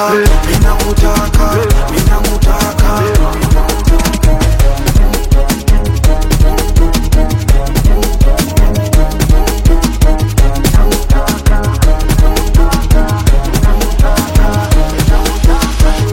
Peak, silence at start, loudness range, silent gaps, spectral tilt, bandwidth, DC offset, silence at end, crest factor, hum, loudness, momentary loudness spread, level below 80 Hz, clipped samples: 0 dBFS; 0 s; 0 LU; none; -5.5 dB/octave; 17 kHz; under 0.1%; 0 s; 8 dB; none; -12 LUFS; 2 LU; -10 dBFS; 0.2%